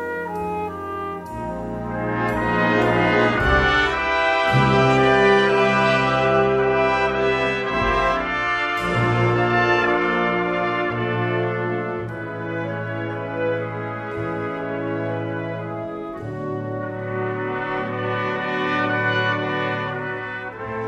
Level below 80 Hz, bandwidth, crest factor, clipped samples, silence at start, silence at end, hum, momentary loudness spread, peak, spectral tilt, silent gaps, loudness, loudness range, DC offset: -40 dBFS; 12.5 kHz; 18 dB; under 0.1%; 0 s; 0 s; none; 12 LU; -4 dBFS; -6.5 dB/octave; none; -21 LUFS; 10 LU; under 0.1%